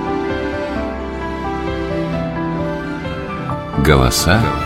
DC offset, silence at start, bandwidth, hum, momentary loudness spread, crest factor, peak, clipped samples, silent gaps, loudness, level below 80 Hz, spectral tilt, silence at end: under 0.1%; 0 s; 16 kHz; none; 11 LU; 18 dB; 0 dBFS; under 0.1%; none; -19 LUFS; -28 dBFS; -5 dB/octave; 0 s